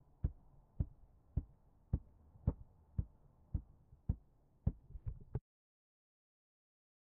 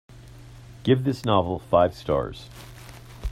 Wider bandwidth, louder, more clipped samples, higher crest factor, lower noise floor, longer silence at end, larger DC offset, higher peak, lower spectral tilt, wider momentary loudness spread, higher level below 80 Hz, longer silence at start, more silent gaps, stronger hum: second, 2.2 kHz vs 15.5 kHz; second, -46 LUFS vs -24 LUFS; neither; about the same, 24 dB vs 20 dB; first, -67 dBFS vs -45 dBFS; first, 1.7 s vs 0 s; neither; second, -22 dBFS vs -6 dBFS; first, -13 dB/octave vs -7 dB/octave; second, 12 LU vs 22 LU; second, -50 dBFS vs -44 dBFS; about the same, 0.25 s vs 0.15 s; neither; neither